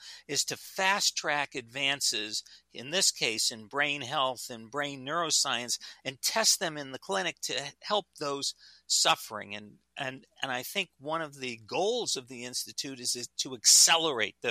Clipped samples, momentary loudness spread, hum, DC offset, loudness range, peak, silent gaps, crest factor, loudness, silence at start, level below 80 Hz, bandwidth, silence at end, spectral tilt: under 0.1%; 14 LU; none; under 0.1%; 7 LU; -8 dBFS; none; 22 dB; -28 LUFS; 0 s; -78 dBFS; 15.5 kHz; 0 s; -0.5 dB/octave